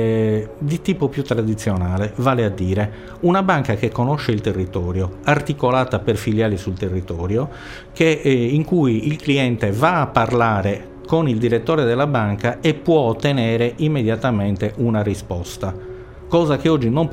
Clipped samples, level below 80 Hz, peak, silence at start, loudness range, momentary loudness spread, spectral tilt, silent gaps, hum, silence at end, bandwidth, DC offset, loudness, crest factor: under 0.1%; -42 dBFS; 0 dBFS; 0 s; 3 LU; 7 LU; -7 dB/octave; none; none; 0 s; 16 kHz; under 0.1%; -19 LUFS; 18 dB